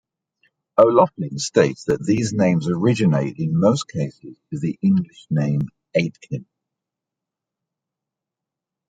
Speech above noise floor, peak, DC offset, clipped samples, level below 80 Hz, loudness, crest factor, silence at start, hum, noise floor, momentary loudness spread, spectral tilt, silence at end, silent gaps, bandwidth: 66 dB; -2 dBFS; under 0.1%; under 0.1%; -58 dBFS; -20 LUFS; 20 dB; 0.75 s; none; -86 dBFS; 11 LU; -6.5 dB/octave; 2.45 s; none; 9.2 kHz